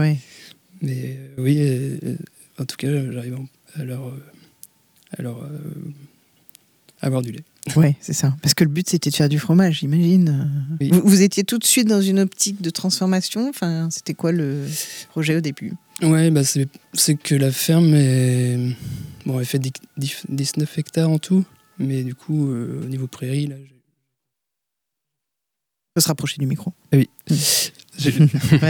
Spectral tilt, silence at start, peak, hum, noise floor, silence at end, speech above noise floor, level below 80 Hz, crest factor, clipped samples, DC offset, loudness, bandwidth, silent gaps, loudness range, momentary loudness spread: -5 dB/octave; 0 s; -2 dBFS; none; -82 dBFS; 0 s; 63 dB; -58 dBFS; 18 dB; under 0.1%; under 0.1%; -20 LUFS; 19.5 kHz; none; 13 LU; 16 LU